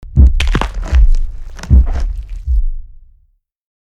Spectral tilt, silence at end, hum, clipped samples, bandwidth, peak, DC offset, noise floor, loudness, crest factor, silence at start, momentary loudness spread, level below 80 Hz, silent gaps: -6.5 dB/octave; 0.95 s; none; under 0.1%; 8 kHz; 0 dBFS; under 0.1%; -55 dBFS; -16 LUFS; 12 dB; 0 s; 16 LU; -14 dBFS; none